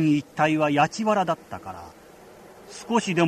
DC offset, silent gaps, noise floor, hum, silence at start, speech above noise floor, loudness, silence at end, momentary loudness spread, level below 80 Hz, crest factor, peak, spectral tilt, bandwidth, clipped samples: under 0.1%; none; -48 dBFS; none; 0 s; 24 dB; -23 LUFS; 0 s; 20 LU; -62 dBFS; 18 dB; -6 dBFS; -5.5 dB/octave; 14 kHz; under 0.1%